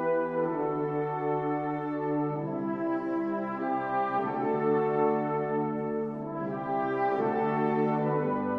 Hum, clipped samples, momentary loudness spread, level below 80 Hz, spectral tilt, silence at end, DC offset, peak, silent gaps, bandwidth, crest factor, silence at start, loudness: none; under 0.1%; 5 LU; -66 dBFS; -10 dB/octave; 0 s; under 0.1%; -14 dBFS; none; 5.6 kHz; 14 dB; 0 s; -30 LUFS